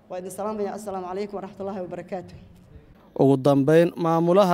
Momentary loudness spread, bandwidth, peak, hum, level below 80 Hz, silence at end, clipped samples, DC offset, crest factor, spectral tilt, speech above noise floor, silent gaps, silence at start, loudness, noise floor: 16 LU; 16 kHz; -6 dBFS; none; -60 dBFS; 0 s; under 0.1%; under 0.1%; 18 dB; -7.5 dB/octave; 27 dB; none; 0.1 s; -23 LUFS; -49 dBFS